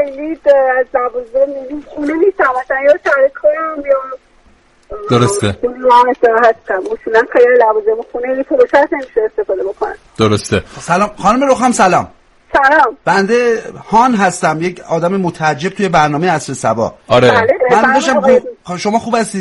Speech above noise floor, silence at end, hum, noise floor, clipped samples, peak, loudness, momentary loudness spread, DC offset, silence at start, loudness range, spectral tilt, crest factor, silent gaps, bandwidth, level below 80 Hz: 36 dB; 0 s; none; -48 dBFS; under 0.1%; 0 dBFS; -12 LUFS; 9 LU; under 0.1%; 0 s; 3 LU; -5 dB/octave; 12 dB; none; 11.5 kHz; -44 dBFS